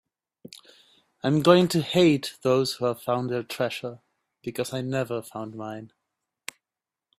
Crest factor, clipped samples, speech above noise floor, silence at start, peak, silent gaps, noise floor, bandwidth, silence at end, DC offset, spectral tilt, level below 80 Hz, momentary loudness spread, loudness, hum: 24 dB; under 0.1%; 65 dB; 1.25 s; -4 dBFS; none; -90 dBFS; 15.5 kHz; 1.35 s; under 0.1%; -5.5 dB/octave; -66 dBFS; 22 LU; -25 LUFS; none